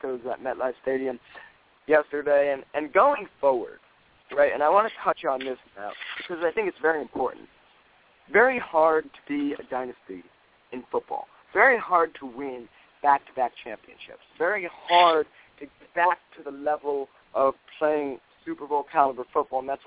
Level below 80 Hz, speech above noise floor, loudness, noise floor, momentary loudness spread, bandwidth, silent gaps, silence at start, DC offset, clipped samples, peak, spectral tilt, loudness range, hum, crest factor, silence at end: -68 dBFS; 34 dB; -25 LUFS; -59 dBFS; 19 LU; 4 kHz; none; 0.05 s; under 0.1%; under 0.1%; -4 dBFS; -7.5 dB/octave; 3 LU; none; 22 dB; 0.1 s